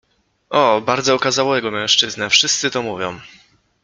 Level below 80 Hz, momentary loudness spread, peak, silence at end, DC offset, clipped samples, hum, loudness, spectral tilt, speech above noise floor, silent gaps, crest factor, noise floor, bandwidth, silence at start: -60 dBFS; 11 LU; 0 dBFS; 0.55 s; under 0.1%; under 0.1%; none; -16 LUFS; -2 dB/octave; 27 dB; none; 18 dB; -44 dBFS; 10 kHz; 0.5 s